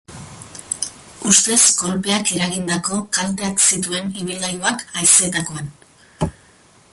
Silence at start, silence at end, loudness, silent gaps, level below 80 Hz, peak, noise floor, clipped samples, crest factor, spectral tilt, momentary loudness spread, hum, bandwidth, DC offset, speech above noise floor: 0.1 s; 0.6 s; -17 LUFS; none; -48 dBFS; 0 dBFS; -50 dBFS; under 0.1%; 20 dB; -2 dB/octave; 16 LU; none; 12 kHz; under 0.1%; 32 dB